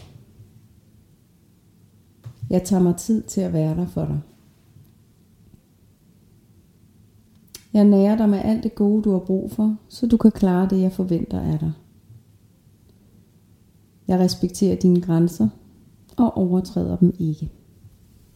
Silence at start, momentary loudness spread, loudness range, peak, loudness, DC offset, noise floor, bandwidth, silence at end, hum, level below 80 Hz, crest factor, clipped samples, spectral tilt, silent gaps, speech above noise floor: 0.4 s; 9 LU; 9 LU; -2 dBFS; -20 LUFS; under 0.1%; -56 dBFS; 15 kHz; 0.5 s; none; -46 dBFS; 20 dB; under 0.1%; -8 dB/octave; none; 37 dB